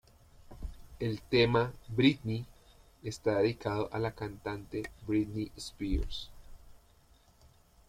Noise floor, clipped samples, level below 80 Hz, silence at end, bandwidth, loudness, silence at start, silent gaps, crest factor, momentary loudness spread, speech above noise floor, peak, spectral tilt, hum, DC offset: -63 dBFS; under 0.1%; -46 dBFS; 1.1 s; 15.5 kHz; -33 LUFS; 0.4 s; none; 22 dB; 18 LU; 31 dB; -12 dBFS; -6.5 dB/octave; none; under 0.1%